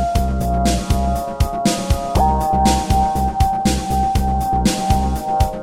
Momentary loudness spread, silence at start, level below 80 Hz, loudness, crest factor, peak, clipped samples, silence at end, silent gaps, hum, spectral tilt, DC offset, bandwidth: 4 LU; 0 s; -22 dBFS; -18 LUFS; 16 dB; -2 dBFS; under 0.1%; 0 s; none; none; -5.5 dB/octave; 0.6%; 18.5 kHz